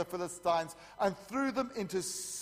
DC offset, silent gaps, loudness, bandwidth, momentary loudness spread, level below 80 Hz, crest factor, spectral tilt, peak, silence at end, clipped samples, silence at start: under 0.1%; none; -35 LUFS; 15.5 kHz; 4 LU; -68 dBFS; 18 dB; -3.5 dB/octave; -18 dBFS; 0 s; under 0.1%; 0 s